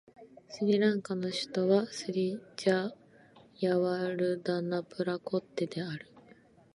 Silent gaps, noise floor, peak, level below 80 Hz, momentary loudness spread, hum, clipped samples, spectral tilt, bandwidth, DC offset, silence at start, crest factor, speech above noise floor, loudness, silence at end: none; -60 dBFS; -14 dBFS; -78 dBFS; 8 LU; none; under 0.1%; -6 dB/octave; 11.5 kHz; under 0.1%; 0.2 s; 18 dB; 29 dB; -32 LUFS; 0.55 s